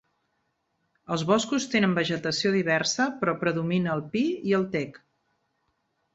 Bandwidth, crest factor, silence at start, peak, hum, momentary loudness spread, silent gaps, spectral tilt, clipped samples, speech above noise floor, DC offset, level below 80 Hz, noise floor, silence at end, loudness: 8 kHz; 20 dB; 1.1 s; -8 dBFS; none; 6 LU; none; -4.5 dB/octave; under 0.1%; 50 dB; under 0.1%; -66 dBFS; -75 dBFS; 1.15 s; -26 LUFS